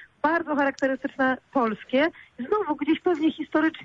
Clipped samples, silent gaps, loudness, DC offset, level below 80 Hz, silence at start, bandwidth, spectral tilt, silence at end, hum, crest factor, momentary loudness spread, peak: under 0.1%; none; -25 LUFS; under 0.1%; -64 dBFS; 0 s; 7.6 kHz; -5.5 dB/octave; 0 s; none; 14 dB; 3 LU; -12 dBFS